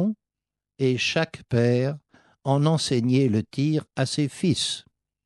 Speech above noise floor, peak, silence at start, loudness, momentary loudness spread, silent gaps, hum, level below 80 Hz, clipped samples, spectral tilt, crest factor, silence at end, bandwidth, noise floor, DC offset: 65 dB; -8 dBFS; 0 s; -24 LUFS; 8 LU; none; none; -62 dBFS; under 0.1%; -5.5 dB/octave; 16 dB; 0.45 s; 12 kHz; -88 dBFS; under 0.1%